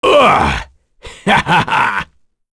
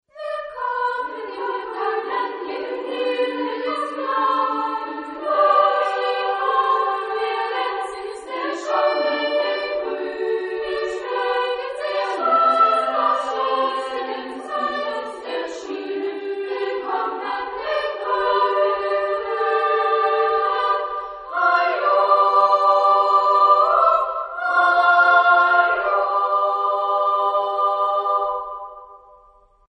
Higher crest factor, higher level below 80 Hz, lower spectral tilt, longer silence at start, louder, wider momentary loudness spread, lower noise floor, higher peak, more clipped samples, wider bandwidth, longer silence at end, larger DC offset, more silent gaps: about the same, 14 dB vs 16 dB; first, -34 dBFS vs -62 dBFS; first, -4.5 dB/octave vs -2.5 dB/octave; second, 0 s vs 0.15 s; first, -13 LUFS vs -20 LUFS; about the same, 13 LU vs 13 LU; second, -37 dBFS vs -53 dBFS; first, 0 dBFS vs -4 dBFS; neither; about the same, 11 kHz vs 10 kHz; second, 0.5 s vs 0.8 s; neither; neither